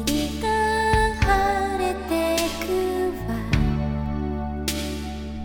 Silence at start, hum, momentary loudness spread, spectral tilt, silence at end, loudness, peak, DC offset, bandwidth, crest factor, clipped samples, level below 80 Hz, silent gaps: 0 s; none; 8 LU; -5 dB/octave; 0 s; -24 LUFS; -6 dBFS; under 0.1%; 19 kHz; 18 dB; under 0.1%; -32 dBFS; none